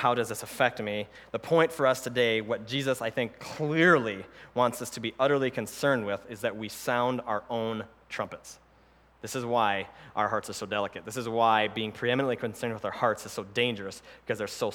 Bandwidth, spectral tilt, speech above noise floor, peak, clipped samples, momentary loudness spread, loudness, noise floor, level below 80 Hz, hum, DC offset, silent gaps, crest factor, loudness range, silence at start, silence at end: 19 kHz; -4.5 dB/octave; 31 dB; -8 dBFS; under 0.1%; 12 LU; -29 LUFS; -60 dBFS; -66 dBFS; none; under 0.1%; none; 22 dB; 5 LU; 0 s; 0 s